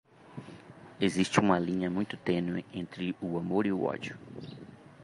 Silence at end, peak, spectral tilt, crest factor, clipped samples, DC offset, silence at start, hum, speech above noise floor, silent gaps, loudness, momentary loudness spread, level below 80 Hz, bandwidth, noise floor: 0 s; -10 dBFS; -6 dB/octave; 22 dB; under 0.1%; under 0.1%; 0.25 s; none; 20 dB; none; -31 LUFS; 23 LU; -62 dBFS; 11.5 kHz; -51 dBFS